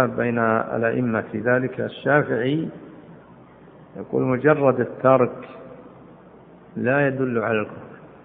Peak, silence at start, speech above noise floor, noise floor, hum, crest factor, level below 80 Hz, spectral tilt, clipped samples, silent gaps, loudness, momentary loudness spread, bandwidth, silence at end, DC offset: -2 dBFS; 0 s; 26 dB; -47 dBFS; none; 20 dB; -62 dBFS; -11.5 dB/octave; under 0.1%; none; -21 LUFS; 22 LU; 4 kHz; 0.2 s; under 0.1%